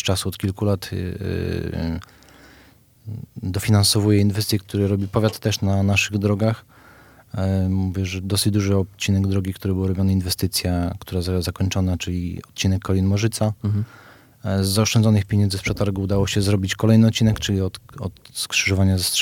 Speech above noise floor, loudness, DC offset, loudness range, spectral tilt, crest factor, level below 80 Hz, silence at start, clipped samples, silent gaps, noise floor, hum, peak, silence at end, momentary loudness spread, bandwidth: 31 dB; -21 LUFS; under 0.1%; 4 LU; -5 dB/octave; 18 dB; -44 dBFS; 0 s; under 0.1%; none; -52 dBFS; none; -4 dBFS; 0 s; 11 LU; 16.5 kHz